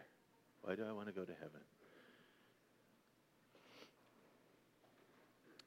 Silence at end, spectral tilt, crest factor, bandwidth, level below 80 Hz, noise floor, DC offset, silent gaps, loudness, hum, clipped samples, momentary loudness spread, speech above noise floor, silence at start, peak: 0 s; -6.5 dB/octave; 28 dB; 16 kHz; under -90 dBFS; -75 dBFS; under 0.1%; none; -49 LUFS; none; under 0.1%; 21 LU; 27 dB; 0 s; -28 dBFS